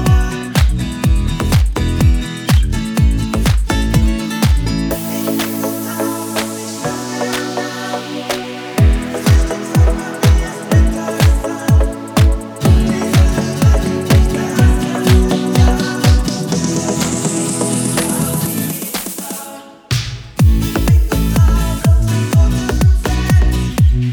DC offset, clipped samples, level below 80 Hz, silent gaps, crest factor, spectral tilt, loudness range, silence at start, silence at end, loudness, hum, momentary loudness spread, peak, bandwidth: under 0.1%; under 0.1%; -18 dBFS; none; 14 dB; -5.5 dB/octave; 5 LU; 0 s; 0 s; -15 LUFS; none; 8 LU; 0 dBFS; over 20 kHz